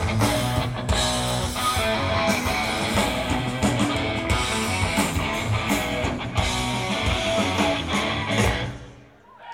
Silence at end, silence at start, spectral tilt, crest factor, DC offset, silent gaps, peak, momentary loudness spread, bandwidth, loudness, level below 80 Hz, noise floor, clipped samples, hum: 0 s; 0 s; -4 dB/octave; 18 dB; under 0.1%; none; -4 dBFS; 3 LU; 16.5 kHz; -23 LUFS; -36 dBFS; -48 dBFS; under 0.1%; none